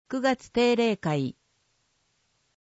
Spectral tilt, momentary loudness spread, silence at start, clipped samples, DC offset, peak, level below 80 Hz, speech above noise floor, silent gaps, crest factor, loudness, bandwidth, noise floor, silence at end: -5.5 dB/octave; 7 LU; 0.1 s; under 0.1%; under 0.1%; -10 dBFS; -64 dBFS; 46 dB; none; 18 dB; -26 LUFS; 8 kHz; -72 dBFS; 1.35 s